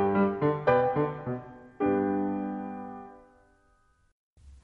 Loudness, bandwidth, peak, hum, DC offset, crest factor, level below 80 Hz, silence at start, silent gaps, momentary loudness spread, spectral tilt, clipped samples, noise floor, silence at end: -28 LUFS; 5.2 kHz; -12 dBFS; none; under 0.1%; 18 dB; -60 dBFS; 0 s; 4.12-4.36 s; 18 LU; -10 dB/octave; under 0.1%; -66 dBFS; 0.05 s